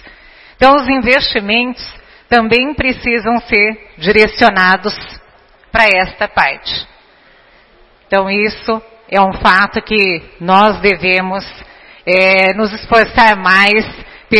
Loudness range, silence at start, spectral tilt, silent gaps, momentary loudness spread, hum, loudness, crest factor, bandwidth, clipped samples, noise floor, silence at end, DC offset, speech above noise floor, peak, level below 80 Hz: 5 LU; 0.05 s; -5.5 dB/octave; none; 12 LU; none; -11 LUFS; 12 dB; 11 kHz; 0.3%; -46 dBFS; 0 s; under 0.1%; 35 dB; 0 dBFS; -36 dBFS